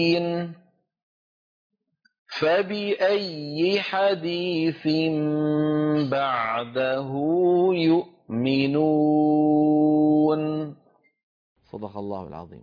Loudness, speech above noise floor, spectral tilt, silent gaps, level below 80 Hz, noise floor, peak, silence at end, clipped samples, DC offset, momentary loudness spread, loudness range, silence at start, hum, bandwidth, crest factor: -23 LUFS; over 68 dB; -8 dB/octave; 1.03-1.70 s, 2.19-2.25 s, 11.23-11.56 s; -66 dBFS; under -90 dBFS; -10 dBFS; 0 s; under 0.1%; under 0.1%; 14 LU; 5 LU; 0 s; none; 5.2 kHz; 14 dB